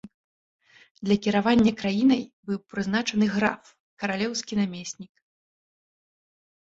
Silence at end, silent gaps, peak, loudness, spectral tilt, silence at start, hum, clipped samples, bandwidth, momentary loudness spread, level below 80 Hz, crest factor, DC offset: 1.65 s; 0.14-0.59 s, 0.91-0.95 s, 2.33-2.43 s, 3.80-3.97 s; -8 dBFS; -25 LUFS; -5 dB/octave; 0.05 s; none; under 0.1%; 8 kHz; 14 LU; -58 dBFS; 20 dB; under 0.1%